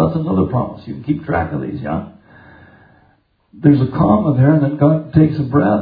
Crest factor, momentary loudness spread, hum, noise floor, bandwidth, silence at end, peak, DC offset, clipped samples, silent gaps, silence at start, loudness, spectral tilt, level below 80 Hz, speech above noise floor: 16 dB; 11 LU; none; -57 dBFS; 5 kHz; 0 s; 0 dBFS; under 0.1%; under 0.1%; none; 0 s; -16 LUFS; -12.5 dB/octave; -42 dBFS; 42 dB